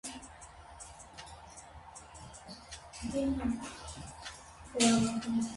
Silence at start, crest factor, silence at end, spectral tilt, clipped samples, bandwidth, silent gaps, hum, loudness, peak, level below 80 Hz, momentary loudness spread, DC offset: 0.05 s; 22 dB; 0 s; -4 dB/octave; under 0.1%; 11.5 kHz; none; none; -33 LUFS; -14 dBFS; -54 dBFS; 22 LU; under 0.1%